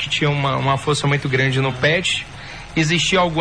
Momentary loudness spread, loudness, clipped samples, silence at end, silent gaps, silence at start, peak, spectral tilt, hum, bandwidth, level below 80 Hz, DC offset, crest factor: 7 LU; -18 LUFS; under 0.1%; 0 s; none; 0 s; -6 dBFS; -4.5 dB/octave; none; 10.5 kHz; -44 dBFS; 0.3%; 12 dB